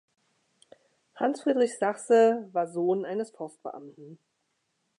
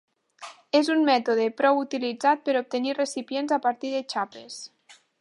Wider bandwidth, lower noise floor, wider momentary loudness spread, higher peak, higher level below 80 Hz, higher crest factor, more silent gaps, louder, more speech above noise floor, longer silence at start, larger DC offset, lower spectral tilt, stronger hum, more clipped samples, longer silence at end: about the same, 11 kHz vs 11.5 kHz; first, -77 dBFS vs -46 dBFS; about the same, 20 LU vs 18 LU; second, -12 dBFS vs -8 dBFS; about the same, -88 dBFS vs -84 dBFS; about the same, 18 dB vs 18 dB; neither; about the same, -26 LUFS vs -25 LUFS; first, 50 dB vs 22 dB; first, 1.15 s vs 0.4 s; neither; first, -5.5 dB/octave vs -3 dB/octave; neither; neither; first, 0.85 s vs 0.55 s